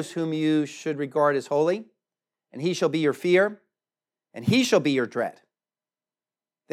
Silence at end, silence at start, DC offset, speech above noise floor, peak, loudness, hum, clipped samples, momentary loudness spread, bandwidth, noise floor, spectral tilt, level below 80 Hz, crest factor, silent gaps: 1.4 s; 0 s; under 0.1%; over 66 dB; -8 dBFS; -24 LUFS; none; under 0.1%; 9 LU; 15 kHz; under -90 dBFS; -5.5 dB/octave; -72 dBFS; 18 dB; none